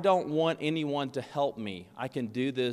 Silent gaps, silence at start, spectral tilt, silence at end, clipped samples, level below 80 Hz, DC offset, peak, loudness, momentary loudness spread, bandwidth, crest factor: none; 0 s; -6.5 dB/octave; 0 s; under 0.1%; -72 dBFS; under 0.1%; -12 dBFS; -31 LUFS; 11 LU; 13.5 kHz; 18 dB